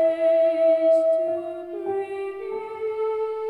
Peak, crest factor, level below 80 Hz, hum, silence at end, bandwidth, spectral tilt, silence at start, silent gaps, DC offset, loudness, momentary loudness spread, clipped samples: -12 dBFS; 10 dB; -68 dBFS; none; 0 s; 4.7 kHz; -6 dB/octave; 0 s; none; under 0.1%; -23 LUFS; 12 LU; under 0.1%